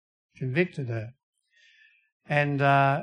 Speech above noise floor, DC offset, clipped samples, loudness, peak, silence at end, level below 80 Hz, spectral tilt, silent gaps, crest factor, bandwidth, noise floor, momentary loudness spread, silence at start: 37 dB; under 0.1%; under 0.1%; -26 LUFS; -8 dBFS; 0 s; -68 dBFS; -8 dB/octave; 1.23-1.33 s, 2.12-2.20 s; 20 dB; 9.4 kHz; -61 dBFS; 15 LU; 0.4 s